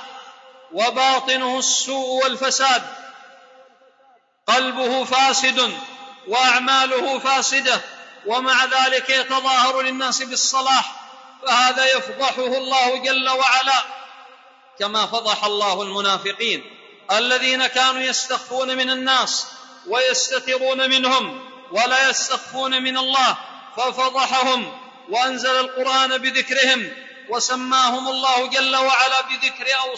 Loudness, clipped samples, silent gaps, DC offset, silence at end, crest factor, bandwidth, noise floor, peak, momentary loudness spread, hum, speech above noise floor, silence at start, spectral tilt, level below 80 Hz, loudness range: -18 LUFS; under 0.1%; none; under 0.1%; 0 s; 16 dB; 8 kHz; -56 dBFS; -4 dBFS; 10 LU; none; 37 dB; 0 s; 0 dB/octave; -82 dBFS; 3 LU